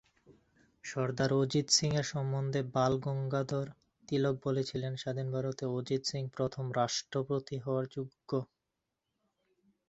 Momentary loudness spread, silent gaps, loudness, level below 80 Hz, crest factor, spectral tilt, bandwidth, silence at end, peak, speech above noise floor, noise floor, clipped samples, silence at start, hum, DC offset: 9 LU; none; -34 LUFS; -66 dBFS; 20 dB; -5 dB/octave; 8.2 kHz; 1.45 s; -14 dBFS; 53 dB; -87 dBFS; under 0.1%; 0.3 s; none; under 0.1%